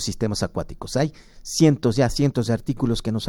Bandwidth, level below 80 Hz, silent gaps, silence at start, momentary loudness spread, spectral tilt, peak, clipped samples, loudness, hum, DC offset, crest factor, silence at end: 17 kHz; -40 dBFS; none; 0 s; 10 LU; -5.5 dB/octave; -4 dBFS; under 0.1%; -22 LUFS; none; under 0.1%; 18 dB; 0 s